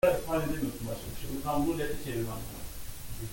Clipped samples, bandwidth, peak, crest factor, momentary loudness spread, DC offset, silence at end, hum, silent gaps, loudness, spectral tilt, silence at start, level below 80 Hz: under 0.1%; 17 kHz; -12 dBFS; 18 dB; 12 LU; under 0.1%; 0 s; none; none; -34 LUFS; -5.5 dB/octave; 0.05 s; -44 dBFS